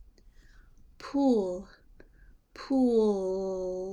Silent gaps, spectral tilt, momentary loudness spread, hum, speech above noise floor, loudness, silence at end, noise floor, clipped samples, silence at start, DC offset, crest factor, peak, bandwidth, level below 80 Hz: none; -7 dB/octave; 16 LU; none; 30 dB; -28 LUFS; 0 s; -57 dBFS; under 0.1%; 1 s; under 0.1%; 16 dB; -14 dBFS; 10.5 kHz; -56 dBFS